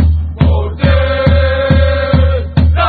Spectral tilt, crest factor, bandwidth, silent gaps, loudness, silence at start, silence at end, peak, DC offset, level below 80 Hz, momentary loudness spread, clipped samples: -10 dB/octave; 10 dB; 4.8 kHz; none; -12 LUFS; 0 s; 0 s; 0 dBFS; under 0.1%; -14 dBFS; 2 LU; 0.2%